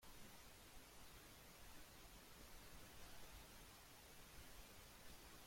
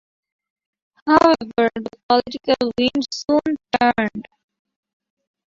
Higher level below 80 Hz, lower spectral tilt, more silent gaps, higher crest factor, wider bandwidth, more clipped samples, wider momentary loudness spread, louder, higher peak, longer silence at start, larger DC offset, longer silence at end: second, -68 dBFS vs -54 dBFS; second, -2.5 dB/octave vs -4.5 dB/octave; second, none vs 2.03-2.09 s; second, 14 dB vs 20 dB; first, 16.5 kHz vs 7.8 kHz; neither; second, 2 LU vs 10 LU; second, -62 LUFS vs -19 LUFS; second, -46 dBFS vs -2 dBFS; second, 0 s vs 1.05 s; neither; second, 0 s vs 1.3 s